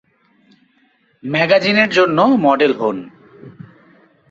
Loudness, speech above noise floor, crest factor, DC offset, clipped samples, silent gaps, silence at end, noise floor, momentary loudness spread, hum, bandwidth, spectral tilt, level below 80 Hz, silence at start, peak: -14 LUFS; 44 dB; 16 dB; under 0.1%; under 0.1%; none; 0.8 s; -58 dBFS; 9 LU; none; 7.8 kHz; -6 dB/octave; -62 dBFS; 1.25 s; 0 dBFS